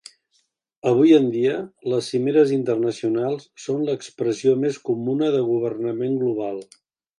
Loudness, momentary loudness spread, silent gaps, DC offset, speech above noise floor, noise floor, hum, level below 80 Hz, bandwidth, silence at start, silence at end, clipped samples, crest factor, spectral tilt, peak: -21 LUFS; 11 LU; none; under 0.1%; 48 dB; -68 dBFS; none; -70 dBFS; 11 kHz; 0.85 s; 0.55 s; under 0.1%; 18 dB; -6.5 dB/octave; -4 dBFS